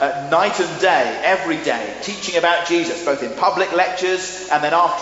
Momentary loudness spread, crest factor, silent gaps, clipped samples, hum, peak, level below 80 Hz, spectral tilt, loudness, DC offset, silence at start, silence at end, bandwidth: 6 LU; 16 dB; none; under 0.1%; none; -2 dBFS; -58 dBFS; -1.5 dB/octave; -18 LUFS; under 0.1%; 0 s; 0 s; 8 kHz